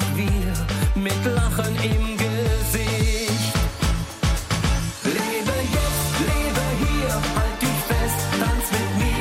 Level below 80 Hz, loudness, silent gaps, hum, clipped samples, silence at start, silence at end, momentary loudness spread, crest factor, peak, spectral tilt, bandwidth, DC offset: -26 dBFS; -22 LUFS; none; none; under 0.1%; 0 s; 0 s; 2 LU; 12 dB; -10 dBFS; -4.5 dB/octave; 16.5 kHz; under 0.1%